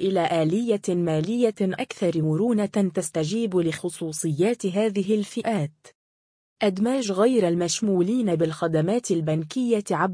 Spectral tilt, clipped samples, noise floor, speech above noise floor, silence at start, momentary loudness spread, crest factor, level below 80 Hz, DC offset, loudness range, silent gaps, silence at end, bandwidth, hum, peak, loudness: -6 dB/octave; under 0.1%; under -90 dBFS; over 67 dB; 0 s; 5 LU; 14 dB; -66 dBFS; under 0.1%; 3 LU; 5.95-6.56 s; 0 s; 10.5 kHz; none; -8 dBFS; -24 LUFS